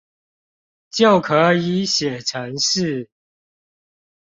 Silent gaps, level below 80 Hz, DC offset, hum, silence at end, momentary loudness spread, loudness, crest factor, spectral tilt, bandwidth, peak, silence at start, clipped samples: none; -60 dBFS; under 0.1%; none; 1.3 s; 10 LU; -18 LUFS; 18 dB; -4 dB/octave; 7.8 kHz; -2 dBFS; 0.95 s; under 0.1%